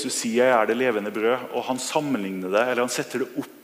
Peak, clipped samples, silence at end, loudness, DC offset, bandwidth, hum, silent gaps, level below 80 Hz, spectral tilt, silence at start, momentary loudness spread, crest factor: -4 dBFS; under 0.1%; 0.05 s; -24 LUFS; under 0.1%; 15.5 kHz; none; none; -74 dBFS; -3.5 dB/octave; 0 s; 8 LU; 20 dB